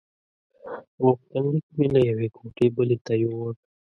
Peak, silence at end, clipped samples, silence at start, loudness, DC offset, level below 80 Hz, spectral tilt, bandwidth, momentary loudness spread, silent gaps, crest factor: -6 dBFS; 0.35 s; under 0.1%; 0.65 s; -24 LUFS; under 0.1%; -58 dBFS; -9.5 dB/octave; 6.6 kHz; 13 LU; 0.88-0.98 s, 1.63-1.69 s, 3.01-3.05 s; 20 dB